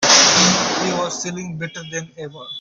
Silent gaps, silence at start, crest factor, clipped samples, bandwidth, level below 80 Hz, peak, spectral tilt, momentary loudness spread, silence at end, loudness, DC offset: none; 0 s; 18 dB; under 0.1%; 11 kHz; -58 dBFS; 0 dBFS; -1.5 dB/octave; 21 LU; 0 s; -14 LUFS; under 0.1%